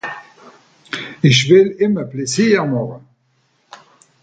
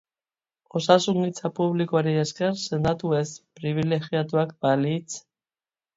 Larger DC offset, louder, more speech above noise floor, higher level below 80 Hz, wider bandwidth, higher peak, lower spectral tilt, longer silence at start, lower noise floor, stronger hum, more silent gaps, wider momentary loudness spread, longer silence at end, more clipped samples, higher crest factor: neither; first, -15 LUFS vs -25 LUFS; second, 47 dB vs over 66 dB; about the same, -56 dBFS vs -58 dBFS; first, 9.2 kHz vs 7.8 kHz; first, 0 dBFS vs -4 dBFS; about the same, -5 dB/octave vs -6 dB/octave; second, 0.05 s vs 0.75 s; second, -61 dBFS vs under -90 dBFS; neither; neither; first, 18 LU vs 11 LU; first, 1.25 s vs 0.75 s; neither; about the same, 18 dB vs 22 dB